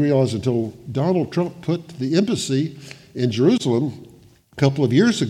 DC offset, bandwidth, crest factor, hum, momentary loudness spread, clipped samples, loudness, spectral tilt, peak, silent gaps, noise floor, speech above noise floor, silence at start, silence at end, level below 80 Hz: under 0.1%; 13.5 kHz; 16 dB; none; 11 LU; under 0.1%; -21 LUFS; -6.5 dB/octave; -4 dBFS; none; -49 dBFS; 30 dB; 0 s; 0 s; -60 dBFS